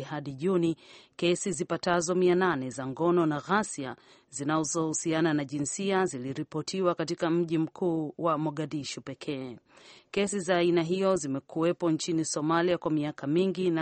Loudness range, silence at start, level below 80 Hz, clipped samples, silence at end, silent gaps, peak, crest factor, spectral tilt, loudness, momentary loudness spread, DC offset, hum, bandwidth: 3 LU; 0 s; -68 dBFS; under 0.1%; 0 s; none; -12 dBFS; 16 dB; -5 dB/octave; -29 LUFS; 10 LU; under 0.1%; none; 8.8 kHz